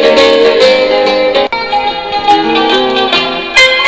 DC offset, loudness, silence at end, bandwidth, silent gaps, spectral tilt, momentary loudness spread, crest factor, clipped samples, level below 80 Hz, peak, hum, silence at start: 0.7%; -8 LUFS; 0 s; 8 kHz; none; -2.5 dB/octave; 6 LU; 8 dB; 2%; -42 dBFS; 0 dBFS; none; 0 s